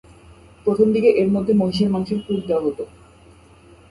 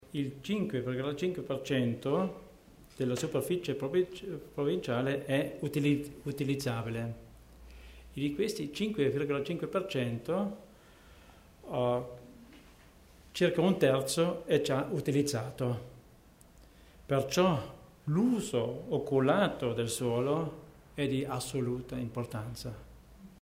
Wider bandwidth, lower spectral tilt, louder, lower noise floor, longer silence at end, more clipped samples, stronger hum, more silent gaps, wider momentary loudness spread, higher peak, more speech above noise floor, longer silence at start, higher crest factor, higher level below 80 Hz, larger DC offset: second, 11.5 kHz vs 16 kHz; first, -8 dB/octave vs -6 dB/octave; first, -19 LUFS vs -33 LUFS; second, -48 dBFS vs -58 dBFS; first, 1.05 s vs 0.05 s; neither; neither; neither; second, 10 LU vs 14 LU; first, -2 dBFS vs -14 dBFS; about the same, 30 dB vs 27 dB; first, 0.65 s vs 0 s; about the same, 18 dB vs 18 dB; first, -50 dBFS vs -60 dBFS; neither